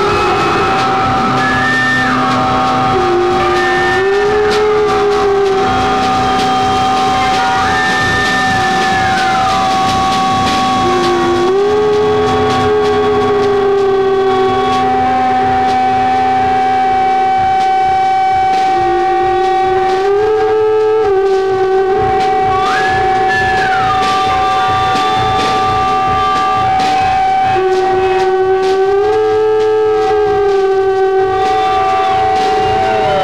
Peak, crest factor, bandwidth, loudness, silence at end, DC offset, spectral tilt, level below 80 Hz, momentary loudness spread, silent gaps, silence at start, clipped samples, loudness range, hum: -4 dBFS; 8 dB; 13 kHz; -12 LUFS; 0 s; 1%; -4.5 dB/octave; -36 dBFS; 1 LU; none; 0 s; under 0.1%; 0 LU; none